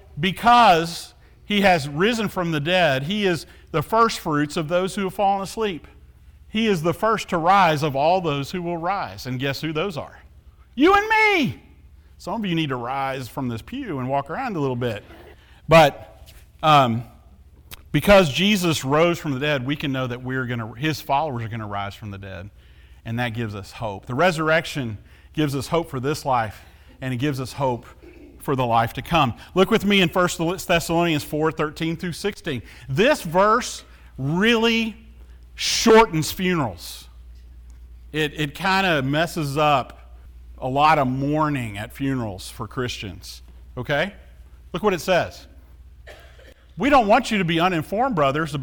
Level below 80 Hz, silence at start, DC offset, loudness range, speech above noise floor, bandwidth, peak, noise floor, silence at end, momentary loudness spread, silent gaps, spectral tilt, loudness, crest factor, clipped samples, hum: -46 dBFS; 0.15 s; under 0.1%; 7 LU; 28 dB; over 20 kHz; -2 dBFS; -49 dBFS; 0 s; 15 LU; none; -5 dB/octave; -21 LUFS; 20 dB; under 0.1%; none